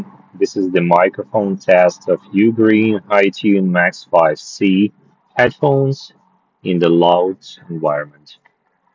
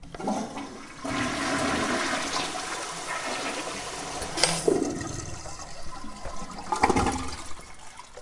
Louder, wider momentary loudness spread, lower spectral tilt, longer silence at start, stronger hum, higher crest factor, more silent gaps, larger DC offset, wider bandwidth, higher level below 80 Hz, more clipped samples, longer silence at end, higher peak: first, -15 LUFS vs -29 LUFS; second, 10 LU vs 16 LU; first, -6.5 dB/octave vs -3 dB/octave; about the same, 0 s vs 0 s; neither; second, 16 dB vs 28 dB; neither; neither; second, 7.6 kHz vs 11.5 kHz; second, -58 dBFS vs -46 dBFS; neither; first, 0.9 s vs 0 s; about the same, 0 dBFS vs -2 dBFS